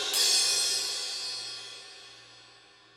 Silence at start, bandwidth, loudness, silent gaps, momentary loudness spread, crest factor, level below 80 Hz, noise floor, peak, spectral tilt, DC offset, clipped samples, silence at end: 0 s; 16.5 kHz; -26 LUFS; none; 24 LU; 20 dB; -82 dBFS; -56 dBFS; -12 dBFS; 2.5 dB/octave; under 0.1%; under 0.1%; 0.5 s